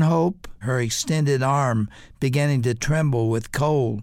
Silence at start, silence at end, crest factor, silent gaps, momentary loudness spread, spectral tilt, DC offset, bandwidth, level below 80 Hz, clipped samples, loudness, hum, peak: 0 s; 0 s; 12 dB; none; 6 LU; -6 dB/octave; under 0.1%; 15.5 kHz; -46 dBFS; under 0.1%; -22 LUFS; none; -8 dBFS